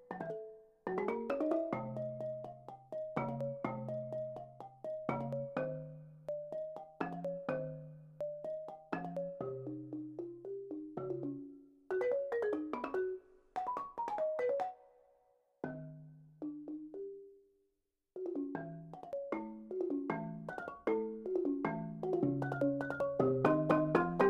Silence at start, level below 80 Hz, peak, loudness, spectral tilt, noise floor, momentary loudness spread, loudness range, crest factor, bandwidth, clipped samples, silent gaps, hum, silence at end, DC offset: 0 s; -70 dBFS; -14 dBFS; -39 LUFS; -9 dB/octave; -84 dBFS; 13 LU; 8 LU; 24 dB; 10 kHz; under 0.1%; none; none; 0 s; under 0.1%